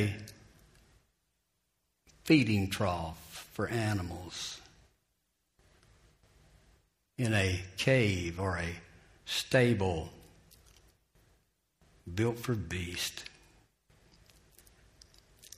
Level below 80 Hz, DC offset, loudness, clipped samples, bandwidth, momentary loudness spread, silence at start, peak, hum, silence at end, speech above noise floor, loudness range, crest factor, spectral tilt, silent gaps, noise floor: -58 dBFS; under 0.1%; -32 LUFS; under 0.1%; 15.5 kHz; 21 LU; 0 s; -10 dBFS; none; 2.3 s; 49 dB; 8 LU; 24 dB; -5.5 dB/octave; none; -80 dBFS